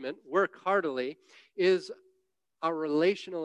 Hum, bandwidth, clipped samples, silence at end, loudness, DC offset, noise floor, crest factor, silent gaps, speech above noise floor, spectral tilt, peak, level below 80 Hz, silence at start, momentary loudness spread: none; 9.8 kHz; under 0.1%; 0 s; -30 LUFS; under 0.1%; -77 dBFS; 16 dB; none; 48 dB; -5.5 dB/octave; -14 dBFS; -84 dBFS; 0 s; 14 LU